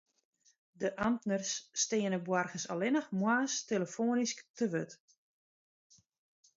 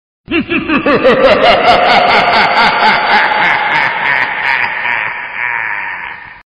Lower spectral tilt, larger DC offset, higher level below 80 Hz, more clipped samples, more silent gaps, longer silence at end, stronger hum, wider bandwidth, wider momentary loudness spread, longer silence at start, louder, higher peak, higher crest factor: about the same, -4 dB/octave vs -4.5 dB/octave; neither; second, -74 dBFS vs -40 dBFS; neither; first, 4.50-4.54 s vs none; first, 1.6 s vs 0.1 s; neither; second, 7.6 kHz vs 10.5 kHz; second, 6 LU vs 10 LU; first, 0.8 s vs 0.3 s; second, -34 LUFS vs -10 LUFS; second, -18 dBFS vs 0 dBFS; first, 18 dB vs 10 dB